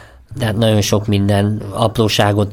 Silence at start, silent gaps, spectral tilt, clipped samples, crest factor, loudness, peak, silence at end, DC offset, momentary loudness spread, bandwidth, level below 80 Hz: 0 s; none; -5.5 dB/octave; under 0.1%; 14 dB; -15 LUFS; 0 dBFS; 0 s; under 0.1%; 7 LU; 16.5 kHz; -40 dBFS